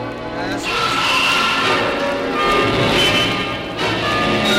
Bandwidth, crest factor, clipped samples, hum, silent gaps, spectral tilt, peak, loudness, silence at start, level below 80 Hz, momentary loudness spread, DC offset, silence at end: 16 kHz; 14 dB; under 0.1%; none; none; -3.5 dB/octave; -4 dBFS; -16 LUFS; 0 s; -40 dBFS; 8 LU; under 0.1%; 0 s